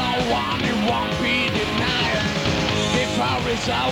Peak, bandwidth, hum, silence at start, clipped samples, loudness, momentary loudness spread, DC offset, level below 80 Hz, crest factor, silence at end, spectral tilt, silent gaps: -8 dBFS; 18.5 kHz; none; 0 s; under 0.1%; -21 LUFS; 2 LU; under 0.1%; -40 dBFS; 12 dB; 0 s; -4.5 dB/octave; none